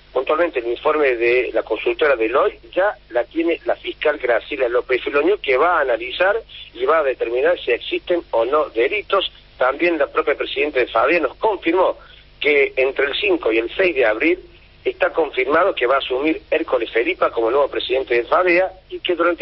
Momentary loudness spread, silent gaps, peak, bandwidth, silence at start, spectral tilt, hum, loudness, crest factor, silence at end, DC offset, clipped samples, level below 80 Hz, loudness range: 5 LU; none; -4 dBFS; 5.8 kHz; 0.15 s; -8 dB/octave; 50 Hz at -50 dBFS; -19 LUFS; 14 dB; 0.05 s; under 0.1%; under 0.1%; -48 dBFS; 1 LU